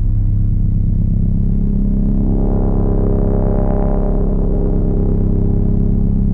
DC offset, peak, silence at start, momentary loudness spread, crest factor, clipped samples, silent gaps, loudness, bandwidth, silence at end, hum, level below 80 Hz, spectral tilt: under 0.1%; -4 dBFS; 0 s; 1 LU; 8 dB; under 0.1%; none; -17 LUFS; 1.8 kHz; 0 s; 50 Hz at -25 dBFS; -16 dBFS; -13 dB/octave